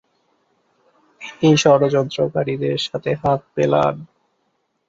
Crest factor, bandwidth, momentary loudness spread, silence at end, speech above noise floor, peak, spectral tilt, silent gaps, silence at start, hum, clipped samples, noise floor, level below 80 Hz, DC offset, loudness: 18 dB; 8 kHz; 9 LU; 0.85 s; 51 dB; -2 dBFS; -5.5 dB/octave; none; 1.2 s; none; under 0.1%; -69 dBFS; -54 dBFS; under 0.1%; -18 LUFS